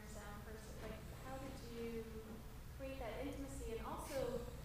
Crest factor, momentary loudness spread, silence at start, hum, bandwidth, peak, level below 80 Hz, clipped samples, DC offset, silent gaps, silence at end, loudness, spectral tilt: 16 dB; 9 LU; 0 s; none; 15.5 kHz; -32 dBFS; -54 dBFS; under 0.1%; under 0.1%; none; 0 s; -49 LUFS; -5.5 dB/octave